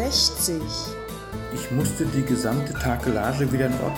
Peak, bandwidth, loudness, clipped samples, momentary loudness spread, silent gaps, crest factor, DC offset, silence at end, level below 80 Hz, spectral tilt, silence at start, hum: -6 dBFS; 17.5 kHz; -24 LUFS; under 0.1%; 12 LU; none; 18 dB; under 0.1%; 0 s; -38 dBFS; -4.5 dB/octave; 0 s; none